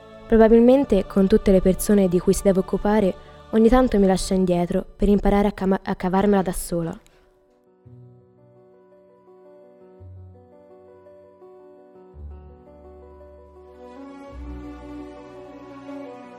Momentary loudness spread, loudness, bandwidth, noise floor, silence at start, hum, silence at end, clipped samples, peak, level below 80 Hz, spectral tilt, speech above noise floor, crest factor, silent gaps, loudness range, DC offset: 24 LU; -19 LUFS; 16.5 kHz; -58 dBFS; 0.15 s; none; 0 s; under 0.1%; -2 dBFS; -36 dBFS; -6.5 dB/octave; 40 dB; 20 dB; none; 23 LU; under 0.1%